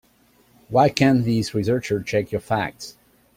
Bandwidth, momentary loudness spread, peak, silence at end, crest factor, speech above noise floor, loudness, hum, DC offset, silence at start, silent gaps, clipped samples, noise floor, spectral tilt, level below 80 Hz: 16 kHz; 11 LU; 0 dBFS; 0.45 s; 22 dB; 38 dB; -21 LUFS; none; under 0.1%; 0.7 s; none; under 0.1%; -58 dBFS; -6 dB/octave; -52 dBFS